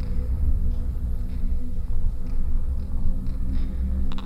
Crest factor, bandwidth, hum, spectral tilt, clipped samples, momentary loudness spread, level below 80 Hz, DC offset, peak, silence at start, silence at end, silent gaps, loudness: 12 dB; 4.1 kHz; none; -8.5 dB/octave; under 0.1%; 5 LU; -22 dBFS; under 0.1%; -10 dBFS; 0 s; 0 s; none; -30 LUFS